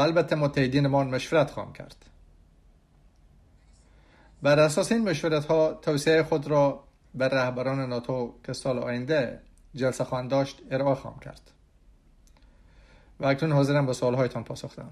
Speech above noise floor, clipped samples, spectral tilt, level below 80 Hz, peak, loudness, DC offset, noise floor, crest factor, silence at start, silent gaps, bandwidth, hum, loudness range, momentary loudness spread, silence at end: 33 dB; under 0.1%; -6 dB/octave; -56 dBFS; -8 dBFS; -26 LUFS; under 0.1%; -59 dBFS; 18 dB; 0 s; none; 13.5 kHz; none; 8 LU; 15 LU; 0 s